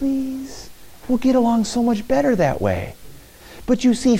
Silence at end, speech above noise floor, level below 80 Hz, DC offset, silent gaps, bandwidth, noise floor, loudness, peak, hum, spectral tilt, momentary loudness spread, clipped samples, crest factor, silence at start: 0 s; 23 dB; -42 dBFS; under 0.1%; none; 16 kHz; -41 dBFS; -19 LUFS; -6 dBFS; none; -6 dB/octave; 17 LU; under 0.1%; 14 dB; 0 s